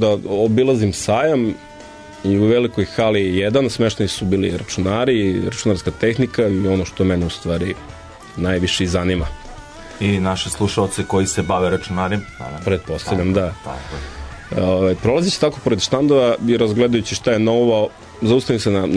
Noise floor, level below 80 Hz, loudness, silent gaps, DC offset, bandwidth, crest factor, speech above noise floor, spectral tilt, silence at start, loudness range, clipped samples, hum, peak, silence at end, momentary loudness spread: -38 dBFS; -38 dBFS; -18 LUFS; none; under 0.1%; 11 kHz; 14 dB; 20 dB; -5.5 dB/octave; 0 s; 5 LU; under 0.1%; none; -4 dBFS; 0 s; 14 LU